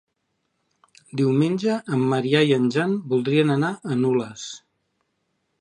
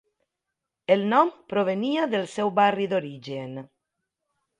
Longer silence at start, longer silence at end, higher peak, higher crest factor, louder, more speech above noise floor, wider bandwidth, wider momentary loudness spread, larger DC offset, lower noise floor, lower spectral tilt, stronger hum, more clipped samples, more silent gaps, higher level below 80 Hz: first, 1.15 s vs 0.9 s; about the same, 1.05 s vs 0.95 s; about the same, -4 dBFS vs -6 dBFS; about the same, 20 dB vs 20 dB; first, -21 LUFS vs -24 LUFS; second, 53 dB vs 61 dB; about the same, 10.5 kHz vs 11 kHz; about the same, 14 LU vs 14 LU; neither; second, -74 dBFS vs -85 dBFS; about the same, -6.5 dB/octave vs -6 dB/octave; neither; neither; neither; about the same, -70 dBFS vs -72 dBFS